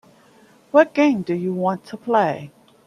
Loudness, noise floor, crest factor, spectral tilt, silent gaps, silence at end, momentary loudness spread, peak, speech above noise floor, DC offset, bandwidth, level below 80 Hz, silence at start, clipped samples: -20 LUFS; -52 dBFS; 20 dB; -7 dB/octave; none; 0.4 s; 8 LU; -2 dBFS; 33 dB; under 0.1%; 11 kHz; -68 dBFS; 0.75 s; under 0.1%